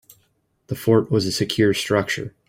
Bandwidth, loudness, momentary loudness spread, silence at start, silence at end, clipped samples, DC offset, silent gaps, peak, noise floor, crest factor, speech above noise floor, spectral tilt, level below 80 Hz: 16.5 kHz; -20 LUFS; 8 LU; 0.7 s; 0.2 s; under 0.1%; under 0.1%; none; -4 dBFS; -66 dBFS; 18 dB; 46 dB; -5 dB/octave; -54 dBFS